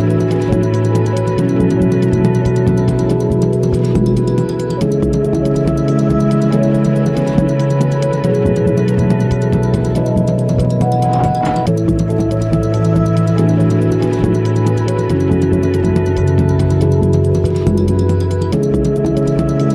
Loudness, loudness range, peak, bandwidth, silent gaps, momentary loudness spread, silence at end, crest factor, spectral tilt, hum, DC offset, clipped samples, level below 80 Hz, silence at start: -14 LUFS; 1 LU; 0 dBFS; 12 kHz; none; 2 LU; 0 s; 12 dB; -8.5 dB/octave; none; under 0.1%; under 0.1%; -30 dBFS; 0 s